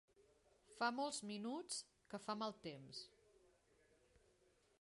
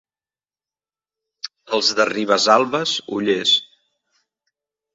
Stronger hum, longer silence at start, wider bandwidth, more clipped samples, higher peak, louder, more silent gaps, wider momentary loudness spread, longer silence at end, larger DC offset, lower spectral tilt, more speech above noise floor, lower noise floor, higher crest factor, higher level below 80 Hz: neither; second, 0.2 s vs 1.45 s; first, 11.5 kHz vs 8 kHz; neither; second, -26 dBFS vs 0 dBFS; second, -47 LUFS vs -18 LUFS; neither; about the same, 13 LU vs 15 LU; first, 1.75 s vs 1.3 s; neither; about the same, -3 dB/octave vs -2.5 dB/octave; second, 30 dB vs over 72 dB; second, -77 dBFS vs under -90 dBFS; about the same, 24 dB vs 22 dB; second, -84 dBFS vs -68 dBFS